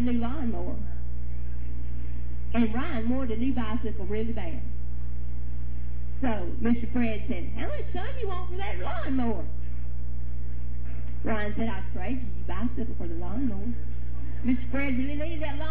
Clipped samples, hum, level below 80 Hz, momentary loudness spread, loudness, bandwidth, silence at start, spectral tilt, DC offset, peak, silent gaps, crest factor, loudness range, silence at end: under 0.1%; 60 Hz at -35 dBFS; -34 dBFS; 9 LU; -32 LUFS; 4 kHz; 0 s; -10.5 dB/octave; 10%; -10 dBFS; none; 16 dB; 3 LU; 0 s